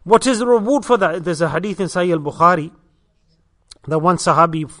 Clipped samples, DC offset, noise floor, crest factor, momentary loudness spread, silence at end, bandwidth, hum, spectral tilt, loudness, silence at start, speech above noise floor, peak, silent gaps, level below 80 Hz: under 0.1%; under 0.1%; -59 dBFS; 18 dB; 7 LU; 0.05 s; 11 kHz; none; -5.5 dB/octave; -16 LUFS; 0.05 s; 44 dB; 0 dBFS; none; -50 dBFS